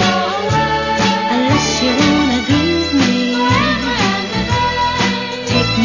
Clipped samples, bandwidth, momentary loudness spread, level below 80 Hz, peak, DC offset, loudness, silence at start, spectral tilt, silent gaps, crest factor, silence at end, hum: under 0.1%; 7.4 kHz; 4 LU; -34 dBFS; -2 dBFS; under 0.1%; -14 LUFS; 0 s; -4.5 dB/octave; none; 12 dB; 0 s; none